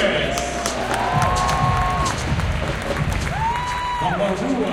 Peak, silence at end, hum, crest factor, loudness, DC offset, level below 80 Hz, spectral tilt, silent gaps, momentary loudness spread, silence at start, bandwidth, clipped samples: -4 dBFS; 0 s; none; 16 dB; -21 LUFS; under 0.1%; -32 dBFS; -4.5 dB/octave; none; 4 LU; 0 s; 17 kHz; under 0.1%